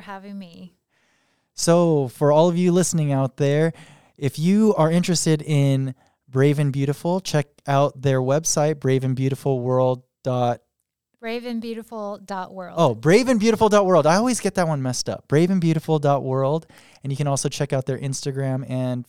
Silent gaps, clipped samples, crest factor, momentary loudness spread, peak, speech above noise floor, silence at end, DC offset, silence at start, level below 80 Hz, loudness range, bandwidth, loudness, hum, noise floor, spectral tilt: none; under 0.1%; 16 dB; 14 LU; -4 dBFS; 55 dB; 0.05 s; 0.3%; 0 s; -60 dBFS; 5 LU; 16 kHz; -21 LUFS; none; -75 dBFS; -6 dB/octave